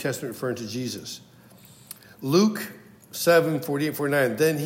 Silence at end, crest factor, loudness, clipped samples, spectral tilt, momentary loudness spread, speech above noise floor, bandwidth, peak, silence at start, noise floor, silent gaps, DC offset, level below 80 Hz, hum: 0 s; 20 dB; -24 LUFS; under 0.1%; -5 dB/octave; 19 LU; 27 dB; 16.5 kHz; -6 dBFS; 0 s; -51 dBFS; none; under 0.1%; -72 dBFS; none